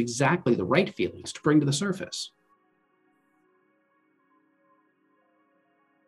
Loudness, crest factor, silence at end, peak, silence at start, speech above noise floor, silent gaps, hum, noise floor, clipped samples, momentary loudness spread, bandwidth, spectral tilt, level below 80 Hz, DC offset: -26 LUFS; 22 dB; 3.8 s; -8 dBFS; 0 s; 43 dB; none; none; -69 dBFS; under 0.1%; 11 LU; 12.5 kHz; -5 dB/octave; -68 dBFS; under 0.1%